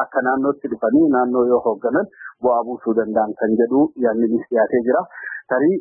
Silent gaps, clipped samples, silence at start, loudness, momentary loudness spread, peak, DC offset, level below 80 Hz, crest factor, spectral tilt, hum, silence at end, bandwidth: none; under 0.1%; 0 s; -19 LUFS; 6 LU; -4 dBFS; under 0.1%; -60 dBFS; 14 dB; -14 dB/octave; none; 0 s; 2.5 kHz